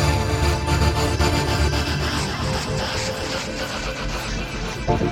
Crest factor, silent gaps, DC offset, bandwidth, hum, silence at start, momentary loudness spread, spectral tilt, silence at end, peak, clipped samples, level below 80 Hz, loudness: 16 dB; none; under 0.1%; 16.5 kHz; none; 0 s; 7 LU; -4.5 dB/octave; 0 s; -6 dBFS; under 0.1%; -28 dBFS; -23 LUFS